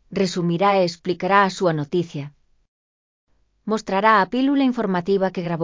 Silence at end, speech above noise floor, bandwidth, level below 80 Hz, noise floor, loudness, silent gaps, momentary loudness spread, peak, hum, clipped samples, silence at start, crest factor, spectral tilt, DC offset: 0 s; over 70 dB; 7.6 kHz; -60 dBFS; under -90 dBFS; -20 LUFS; 2.68-3.27 s; 10 LU; -2 dBFS; none; under 0.1%; 0.1 s; 20 dB; -6 dB/octave; under 0.1%